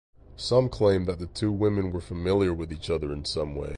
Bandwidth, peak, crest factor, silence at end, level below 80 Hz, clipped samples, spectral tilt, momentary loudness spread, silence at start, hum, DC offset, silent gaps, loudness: 11 kHz; -10 dBFS; 18 dB; 0 s; -42 dBFS; under 0.1%; -6.5 dB/octave; 8 LU; 0.3 s; none; under 0.1%; none; -27 LUFS